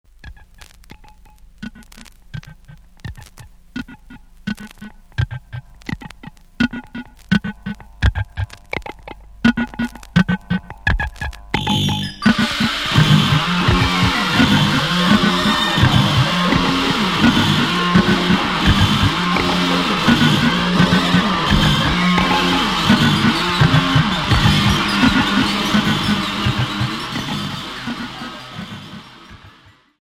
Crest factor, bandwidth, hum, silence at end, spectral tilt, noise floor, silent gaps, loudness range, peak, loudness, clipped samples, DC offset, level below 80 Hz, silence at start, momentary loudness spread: 18 dB; 16 kHz; none; 0.55 s; -5 dB/octave; -49 dBFS; none; 16 LU; 0 dBFS; -16 LUFS; under 0.1%; under 0.1%; -32 dBFS; 0.25 s; 18 LU